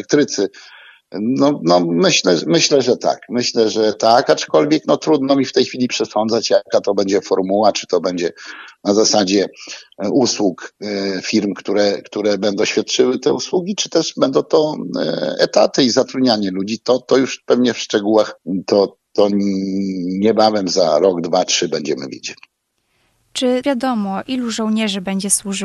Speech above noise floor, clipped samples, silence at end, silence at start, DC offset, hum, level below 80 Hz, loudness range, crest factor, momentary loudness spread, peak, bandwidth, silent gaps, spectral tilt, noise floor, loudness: 50 dB; under 0.1%; 0 s; 0 s; under 0.1%; none; -64 dBFS; 4 LU; 16 dB; 8 LU; 0 dBFS; 13 kHz; none; -4 dB/octave; -66 dBFS; -16 LUFS